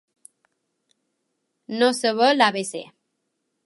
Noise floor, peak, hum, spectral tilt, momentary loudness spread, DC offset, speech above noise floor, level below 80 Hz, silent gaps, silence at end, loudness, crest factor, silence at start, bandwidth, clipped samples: -76 dBFS; -2 dBFS; none; -3 dB/octave; 16 LU; under 0.1%; 56 dB; -82 dBFS; none; 0.8 s; -20 LUFS; 24 dB; 1.7 s; 11.5 kHz; under 0.1%